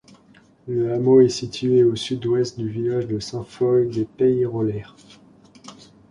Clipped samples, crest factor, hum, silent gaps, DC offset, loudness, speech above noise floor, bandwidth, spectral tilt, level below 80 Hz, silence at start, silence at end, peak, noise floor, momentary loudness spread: under 0.1%; 18 dB; none; none; under 0.1%; -21 LUFS; 33 dB; 10.5 kHz; -7 dB/octave; -56 dBFS; 0.65 s; 0.35 s; -4 dBFS; -53 dBFS; 12 LU